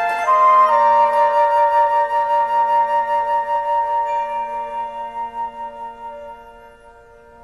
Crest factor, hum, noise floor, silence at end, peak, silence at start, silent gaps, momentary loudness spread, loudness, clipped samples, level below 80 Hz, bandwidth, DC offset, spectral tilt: 12 dB; none; -45 dBFS; 0.75 s; -4 dBFS; 0 s; none; 18 LU; -17 LUFS; under 0.1%; -56 dBFS; 12 kHz; 0.1%; -3 dB/octave